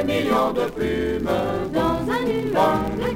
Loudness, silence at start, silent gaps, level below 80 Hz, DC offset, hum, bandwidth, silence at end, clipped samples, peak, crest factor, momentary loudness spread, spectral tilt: -22 LUFS; 0 s; none; -40 dBFS; under 0.1%; none; 17 kHz; 0 s; under 0.1%; -6 dBFS; 16 dB; 4 LU; -6.5 dB/octave